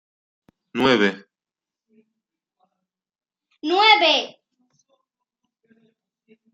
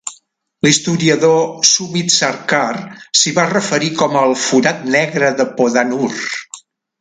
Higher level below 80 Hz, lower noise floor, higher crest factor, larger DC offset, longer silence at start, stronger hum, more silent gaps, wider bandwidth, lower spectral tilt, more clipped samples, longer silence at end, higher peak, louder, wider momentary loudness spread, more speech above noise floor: second, -66 dBFS vs -60 dBFS; first, under -90 dBFS vs -52 dBFS; first, 24 dB vs 16 dB; neither; first, 0.75 s vs 0.05 s; neither; neither; second, 9 kHz vs 10 kHz; about the same, -4 dB/octave vs -3 dB/octave; neither; first, 2.25 s vs 0.4 s; about the same, -2 dBFS vs 0 dBFS; second, -17 LUFS vs -14 LUFS; first, 20 LU vs 9 LU; first, over 72 dB vs 38 dB